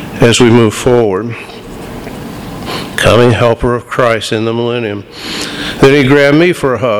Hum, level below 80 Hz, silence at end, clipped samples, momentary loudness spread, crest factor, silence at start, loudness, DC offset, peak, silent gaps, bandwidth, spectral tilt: none; -34 dBFS; 0 s; 0.9%; 18 LU; 10 dB; 0 s; -10 LUFS; under 0.1%; 0 dBFS; none; 20 kHz; -5.5 dB/octave